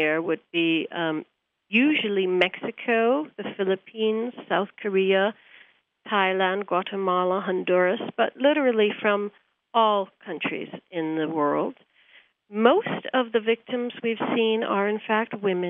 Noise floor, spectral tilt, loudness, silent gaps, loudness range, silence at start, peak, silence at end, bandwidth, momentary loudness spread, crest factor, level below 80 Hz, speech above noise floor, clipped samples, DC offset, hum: -57 dBFS; -7.5 dB/octave; -24 LUFS; none; 3 LU; 0 s; -4 dBFS; 0 s; 4.8 kHz; 8 LU; 20 dB; -80 dBFS; 33 dB; under 0.1%; under 0.1%; none